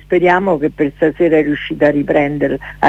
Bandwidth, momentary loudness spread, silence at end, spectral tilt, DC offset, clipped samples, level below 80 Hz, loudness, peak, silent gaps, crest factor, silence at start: 7.8 kHz; 6 LU; 0 s; -8 dB/octave; under 0.1%; under 0.1%; -40 dBFS; -14 LUFS; 0 dBFS; none; 14 dB; 0.1 s